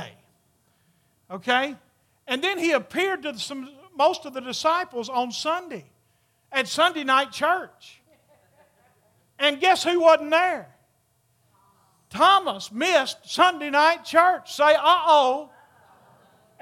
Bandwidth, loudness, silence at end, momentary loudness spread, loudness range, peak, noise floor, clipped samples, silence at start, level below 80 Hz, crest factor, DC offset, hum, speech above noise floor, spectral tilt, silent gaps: 16 kHz; -22 LUFS; 1.15 s; 14 LU; 7 LU; -2 dBFS; -67 dBFS; under 0.1%; 0 s; -76 dBFS; 22 dB; under 0.1%; none; 45 dB; -2 dB/octave; none